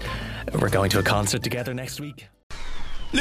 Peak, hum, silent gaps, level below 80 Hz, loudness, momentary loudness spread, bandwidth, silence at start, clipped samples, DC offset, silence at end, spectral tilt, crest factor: -6 dBFS; none; 2.43-2.50 s; -36 dBFS; -25 LUFS; 18 LU; 15.5 kHz; 0 s; under 0.1%; under 0.1%; 0 s; -4.5 dB/octave; 20 dB